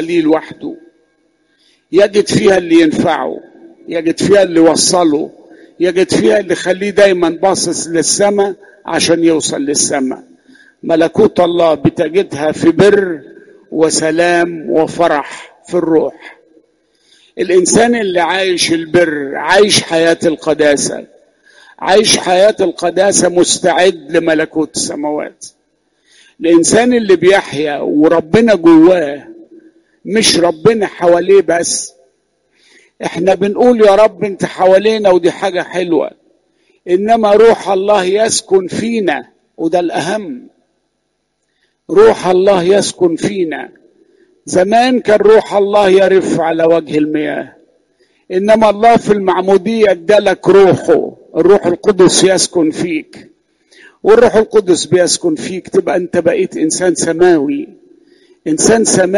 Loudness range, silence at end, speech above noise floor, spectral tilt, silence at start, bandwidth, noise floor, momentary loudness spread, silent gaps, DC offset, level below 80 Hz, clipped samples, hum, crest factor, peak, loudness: 4 LU; 0 s; 56 dB; -4 dB/octave; 0 s; 11.5 kHz; -66 dBFS; 11 LU; none; under 0.1%; -48 dBFS; under 0.1%; none; 12 dB; 0 dBFS; -11 LUFS